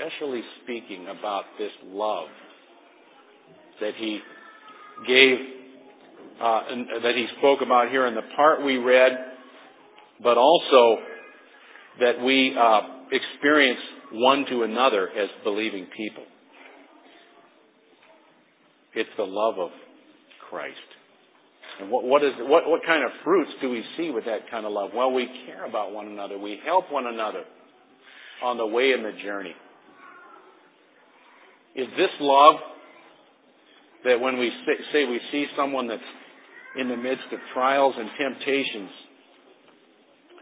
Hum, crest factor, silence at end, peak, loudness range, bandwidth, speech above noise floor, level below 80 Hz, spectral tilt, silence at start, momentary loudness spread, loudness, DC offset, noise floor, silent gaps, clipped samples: none; 24 dB; 1.4 s; -2 dBFS; 12 LU; 4 kHz; 37 dB; under -90 dBFS; -7 dB/octave; 0 s; 18 LU; -23 LUFS; under 0.1%; -61 dBFS; none; under 0.1%